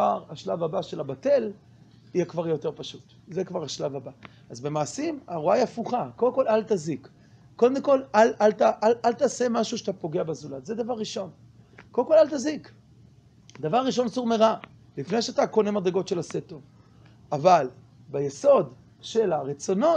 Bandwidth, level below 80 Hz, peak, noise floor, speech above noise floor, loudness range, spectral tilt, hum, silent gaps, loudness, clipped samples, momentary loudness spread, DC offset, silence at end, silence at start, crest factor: 9.6 kHz; -68 dBFS; -6 dBFS; -54 dBFS; 29 dB; 6 LU; -5.5 dB/octave; none; none; -25 LUFS; under 0.1%; 15 LU; under 0.1%; 0 s; 0 s; 20 dB